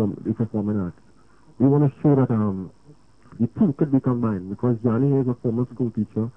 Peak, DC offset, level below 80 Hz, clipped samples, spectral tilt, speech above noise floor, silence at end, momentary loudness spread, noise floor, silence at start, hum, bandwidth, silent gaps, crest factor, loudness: -6 dBFS; 0.2%; -56 dBFS; under 0.1%; -12 dB/octave; 33 dB; 0.05 s; 8 LU; -55 dBFS; 0 s; none; 5.4 kHz; none; 16 dB; -22 LUFS